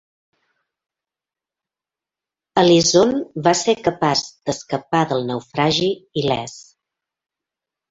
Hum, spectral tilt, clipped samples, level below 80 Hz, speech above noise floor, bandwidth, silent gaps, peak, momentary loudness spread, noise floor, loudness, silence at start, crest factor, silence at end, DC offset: none; -4 dB/octave; under 0.1%; -56 dBFS; 71 dB; 8 kHz; none; -2 dBFS; 12 LU; -89 dBFS; -18 LUFS; 2.55 s; 20 dB; 1.3 s; under 0.1%